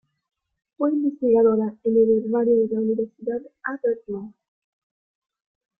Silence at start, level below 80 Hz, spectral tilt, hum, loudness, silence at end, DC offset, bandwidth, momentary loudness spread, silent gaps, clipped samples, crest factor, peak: 0.8 s; -64 dBFS; -13 dB/octave; none; -22 LUFS; 1.5 s; under 0.1%; 2.6 kHz; 12 LU; none; under 0.1%; 16 dB; -8 dBFS